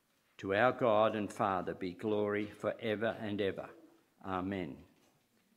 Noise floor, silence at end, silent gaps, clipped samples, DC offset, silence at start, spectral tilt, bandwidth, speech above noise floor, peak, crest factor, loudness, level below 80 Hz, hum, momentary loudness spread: -72 dBFS; 0.75 s; none; under 0.1%; under 0.1%; 0.4 s; -6.5 dB/octave; 15 kHz; 38 dB; -14 dBFS; 22 dB; -35 LUFS; -74 dBFS; none; 16 LU